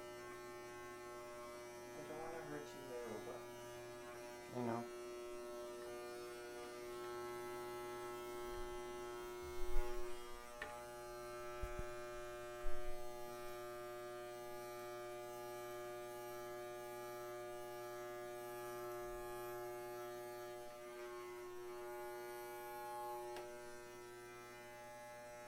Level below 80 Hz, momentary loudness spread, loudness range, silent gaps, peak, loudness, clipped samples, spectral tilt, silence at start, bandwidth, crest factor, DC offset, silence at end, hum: -56 dBFS; 5 LU; 2 LU; none; -22 dBFS; -50 LUFS; under 0.1%; -4.5 dB/octave; 0 s; 16.5 kHz; 24 dB; under 0.1%; 0 s; none